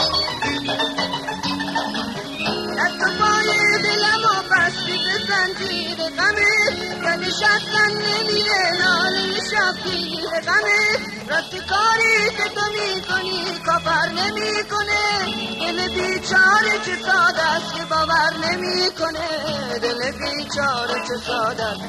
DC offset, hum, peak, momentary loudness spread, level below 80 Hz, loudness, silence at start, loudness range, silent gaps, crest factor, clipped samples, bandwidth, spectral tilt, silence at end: under 0.1%; none; -4 dBFS; 8 LU; -50 dBFS; -19 LUFS; 0 s; 3 LU; none; 16 dB; under 0.1%; 13 kHz; -2.5 dB/octave; 0 s